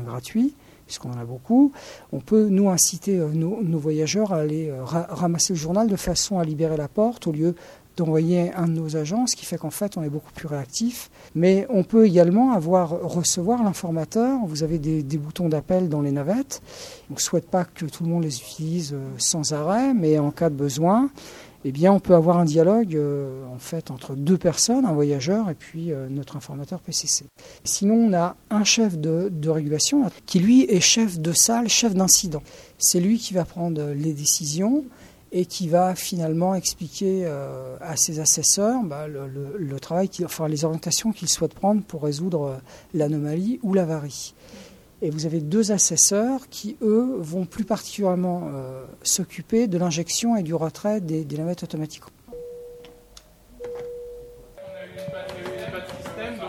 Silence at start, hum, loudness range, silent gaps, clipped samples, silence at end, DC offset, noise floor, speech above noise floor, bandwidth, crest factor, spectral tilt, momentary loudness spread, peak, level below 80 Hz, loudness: 0 s; none; 6 LU; none; under 0.1%; 0 s; under 0.1%; -50 dBFS; 28 dB; 15.5 kHz; 20 dB; -4.5 dB/octave; 16 LU; -2 dBFS; -54 dBFS; -22 LUFS